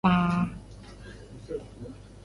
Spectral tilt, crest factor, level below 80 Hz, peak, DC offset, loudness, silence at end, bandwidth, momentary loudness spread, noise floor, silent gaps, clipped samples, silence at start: -7.5 dB/octave; 20 dB; -48 dBFS; -10 dBFS; under 0.1%; -29 LUFS; 0.05 s; 11 kHz; 22 LU; -45 dBFS; none; under 0.1%; 0.05 s